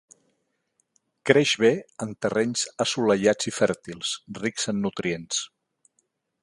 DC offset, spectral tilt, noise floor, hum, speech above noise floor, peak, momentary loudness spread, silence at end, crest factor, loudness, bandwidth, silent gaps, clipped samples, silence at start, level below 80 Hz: under 0.1%; -3.5 dB/octave; -74 dBFS; none; 50 dB; 0 dBFS; 10 LU; 0.95 s; 26 dB; -25 LUFS; 11.5 kHz; none; under 0.1%; 1.25 s; -64 dBFS